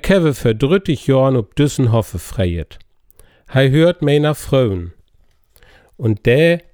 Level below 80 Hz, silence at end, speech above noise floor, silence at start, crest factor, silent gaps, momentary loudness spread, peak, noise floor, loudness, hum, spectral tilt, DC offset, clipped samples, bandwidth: -38 dBFS; 0.15 s; 39 dB; 0.05 s; 14 dB; none; 10 LU; -2 dBFS; -53 dBFS; -16 LUFS; none; -7 dB/octave; under 0.1%; under 0.1%; over 20 kHz